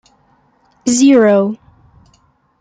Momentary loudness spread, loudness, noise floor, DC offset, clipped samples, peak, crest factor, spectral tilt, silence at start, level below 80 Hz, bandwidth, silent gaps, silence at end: 14 LU; -12 LUFS; -55 dBFS; under 0.1%; under 0.1%; -2 dBFS; 14 dB; -4.5 dB/octave; 0.85 s; -56 dBFS; 9.4 kHz; none; 1.05 s